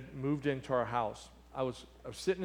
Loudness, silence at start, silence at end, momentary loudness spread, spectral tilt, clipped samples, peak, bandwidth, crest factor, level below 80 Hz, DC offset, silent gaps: -36 LUFS; 0 s; 0 s; 14 LU; -6 dB/octave; under 0.1%; -18 dBFS; 16 kHz; 18 dB; -60 dBFS; under 0.1%; none